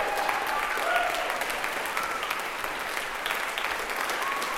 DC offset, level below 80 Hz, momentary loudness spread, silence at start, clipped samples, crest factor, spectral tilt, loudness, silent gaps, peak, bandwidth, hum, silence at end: under 0.1%; -56 dBFS; 5 LU; 0 s; under 0.1%; 20 dB; -0.5 dB/octave; -28 LUFS; none; -10 dBFS; 17 kHz; none; 0 s